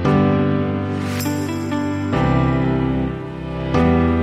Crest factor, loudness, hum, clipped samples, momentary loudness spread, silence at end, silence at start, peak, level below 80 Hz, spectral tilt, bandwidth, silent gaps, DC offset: 14 dB; -19 LUFS; none; under 0.1%; 7 LU; 0 s; 0 s; -4 dBFS; -32 dBFS; -7.5 dB/octave; 16 kHz; none; under 0.1%